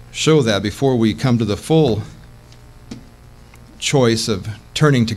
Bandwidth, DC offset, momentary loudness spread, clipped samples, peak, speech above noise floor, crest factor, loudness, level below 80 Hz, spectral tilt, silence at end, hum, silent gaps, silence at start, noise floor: 14.5 kHz; under 0.1%; 21 LU; under 0.1%; -2 dBFS; 26 dB; 16 dB; -17 LUFS; -44 dBFS; -5.5 dB/octave; 0 s; none; none; 0 s; -42 dBFS